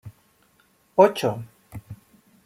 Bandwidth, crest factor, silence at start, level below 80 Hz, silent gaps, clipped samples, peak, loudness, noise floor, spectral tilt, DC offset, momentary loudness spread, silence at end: 16 kHz; 24 dB; 0.05 s; -62 dBFS; none; under 0.1%; -2 dBFS; -21 LUFS; -62 dBFS; -6 dB/octave; under 0.1%; 23 LU; 0.5 s